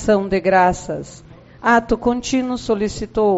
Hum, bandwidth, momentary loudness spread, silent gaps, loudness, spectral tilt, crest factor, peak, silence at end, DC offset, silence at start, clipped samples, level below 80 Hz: none; 8 kHz; 12 LU; none; -18 LUFS; -4.5 dB/octave; 16 dB; -2 dBFS; 0 s; under 0.1%; 0 s; under 0.1%; -40 dBFS